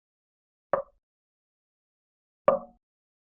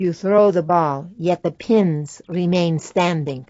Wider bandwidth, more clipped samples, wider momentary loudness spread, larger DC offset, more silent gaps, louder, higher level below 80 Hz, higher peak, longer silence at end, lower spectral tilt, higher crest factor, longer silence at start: second, 3.6 kHz vs 8 kHz; neither; about the same, 7 LU vs 8 LU; neither; first, 1.03-2.45 s vs none; second, -29 LUFS vs -19 LUFS; second, -70 dBFS vs -60 dBFS; second, -8 dBFS vs -4 dBFS; first, 0.75 s vs 0.05 s; second, -1 dB/octave vs -7 dB/octave; first, 28 dB vs 16 dB; first, 0.75 s vs 0 s